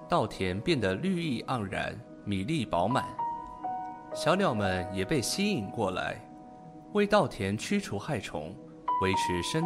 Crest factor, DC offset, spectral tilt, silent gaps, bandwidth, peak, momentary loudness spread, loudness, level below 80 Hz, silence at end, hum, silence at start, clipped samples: 20 dB; under 0.1%; -5 dB/octave; none; 15 kHz; -10 dBFS; 12 LU; -30 LUFS; -56 dBFS; 0 s; none; 0 s; under 0.1%